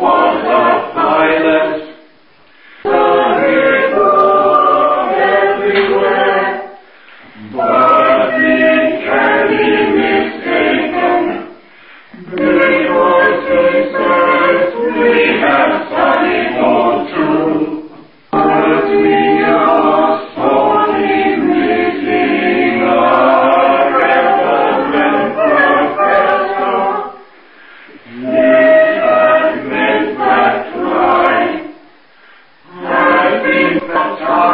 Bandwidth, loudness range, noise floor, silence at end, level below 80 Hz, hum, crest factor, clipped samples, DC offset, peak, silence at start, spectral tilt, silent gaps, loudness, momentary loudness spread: 5.4 kHz; 3 LU; -47 dBFS; 0 s; -50 dBFS; none; 12 dB; under 0.1%; 0.3%; 0 dBFS; 0 s; -8.5 dB/octave; none; -11 LUFS; 6 LU